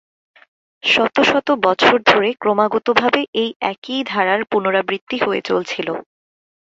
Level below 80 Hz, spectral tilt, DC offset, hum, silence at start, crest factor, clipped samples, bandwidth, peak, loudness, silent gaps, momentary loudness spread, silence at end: -60 dBFS; -4 dB/octave; under 0.1%; none; 0.85 s; 18 dB; under 0.1%; 8 kHz; 0 dBFS; -17 LUFS; 3.28-3.33 s, 3.56-3.60 s, 3.78-3.82 s, 5.01-5.07 s; 10 LU; 0.65 s